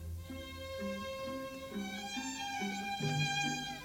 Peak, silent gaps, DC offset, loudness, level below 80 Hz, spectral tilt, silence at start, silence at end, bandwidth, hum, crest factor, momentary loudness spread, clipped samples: -22 dBFS; none; under 0.1%; -38 LUFS; -58 dBFS; -4 dB/octave; 0 s; 0 s; 18.5 kHz; none; 16 dB; 11 LU; under 0.1%